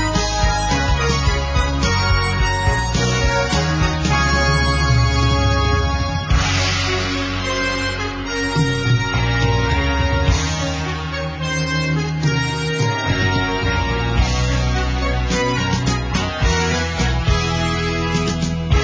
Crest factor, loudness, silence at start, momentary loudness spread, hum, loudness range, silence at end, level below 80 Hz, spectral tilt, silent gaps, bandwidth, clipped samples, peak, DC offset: 16 dB; -18 LUFS; 0 s; 4 LU; none; 2 LU; 0 s; -24 dBFS; -4.5 dB/octave; none; 8 kHz; under 0.1%; -2 dBFS; under 0.1%